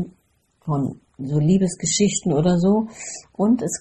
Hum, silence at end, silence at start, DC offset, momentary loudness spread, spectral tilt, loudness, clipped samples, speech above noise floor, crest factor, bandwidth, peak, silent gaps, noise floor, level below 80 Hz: none; 0 s; 0 s; under 0.1%; 15 LU; -5.5 dB/octave; -20 LUFS; under 0.1%; 44 dB; 14 dB; 12 kHz; -6 dBFS; none; -64 dBFS; -50 dBFS